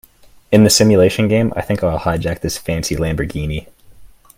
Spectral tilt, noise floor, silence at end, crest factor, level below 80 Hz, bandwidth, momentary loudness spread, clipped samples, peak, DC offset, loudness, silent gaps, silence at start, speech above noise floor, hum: -5 dB/octave; -41 dBFS; 0.3 s; 16 dB; -36 dBFS; 16.5 kHz; 12 LU; under 0.1%; 0 dBFS; under 0.1%; -15 LUFS; none; 0.5 s; 26 dB; none